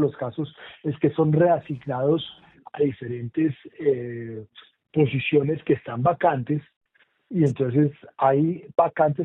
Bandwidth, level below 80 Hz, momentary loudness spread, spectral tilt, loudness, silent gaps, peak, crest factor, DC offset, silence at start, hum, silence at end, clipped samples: 6.6 kHz; -64 dBFS; 12 LU; -9.5 dB/octave; -24 LUFS; 6.76-6.81 s; -6 dBFS; 18 dB; under 0.1%; 0 s; none; 0 s; under 0.1%